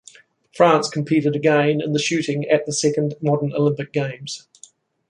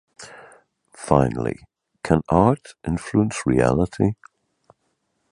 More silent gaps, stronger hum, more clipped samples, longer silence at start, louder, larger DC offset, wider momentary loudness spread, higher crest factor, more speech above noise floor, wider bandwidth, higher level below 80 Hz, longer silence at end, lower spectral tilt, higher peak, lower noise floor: neither; neither; neither; first, 0.55 s vs 0.2 s; about the same, -19 LUFS vs -21 LUFS; neither; second, 9 LU vs 21 LU; about the same, 18 dB vs 22 dB; second, 30 dB vs 52 dB; about the same, 11 kHz vs 11 kHz; second, -66 dBFS vs -42 dBFS; second, 0.7 s vs 1.2 s; second, -5 dB/octave vs -7 dB/octave; about the same, -2 dBFS vs 0 dBFS; second, -49 dBFS vs -72 dBFS